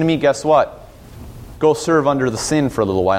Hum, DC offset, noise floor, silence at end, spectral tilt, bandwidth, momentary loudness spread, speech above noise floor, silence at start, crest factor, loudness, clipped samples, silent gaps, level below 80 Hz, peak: none; under 0.1%; -37 dBFS; 0 s; -5.5 dB/octave; 16 kHz; 17 LU; 21 dB; 0 s; 16 dB; -17 LUFS; under 0.1%; none; -42 dBFS; -2 dBFS